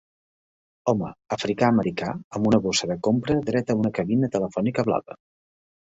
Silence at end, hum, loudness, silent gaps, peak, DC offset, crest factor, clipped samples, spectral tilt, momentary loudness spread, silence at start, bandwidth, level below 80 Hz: 0.8 s; none; -24 LUFS; 2.24-2.31 s; -6 dBFS; under 0.1%; 18 dB; under 0.1%; -5.5 dB/octave; 8 LU; 0.85 s; 8 kHz; -54 dBFS